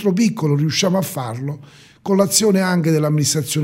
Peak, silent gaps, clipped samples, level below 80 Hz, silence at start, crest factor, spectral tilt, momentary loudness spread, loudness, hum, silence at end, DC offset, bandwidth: -2 dBFS; none; under 0.1%; -60 dBFS; 0 s; 16 dB; -5 dB/octave; 13 LU; -17 LUFS; none; 0 s; under 0.1%; 16.5 kHz